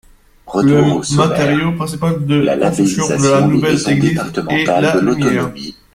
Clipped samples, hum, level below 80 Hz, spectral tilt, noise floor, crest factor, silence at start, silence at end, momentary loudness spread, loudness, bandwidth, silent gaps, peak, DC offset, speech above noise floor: under 0.1%; none; -44 dBFS; -5.5 dB/octave; -38 dBFS; 14 dB; 0.45 s; 0.25 s; 7 LU; -14 LUFS; 15 kHz; none; 0 dBFS; under 0.1%; 25 dB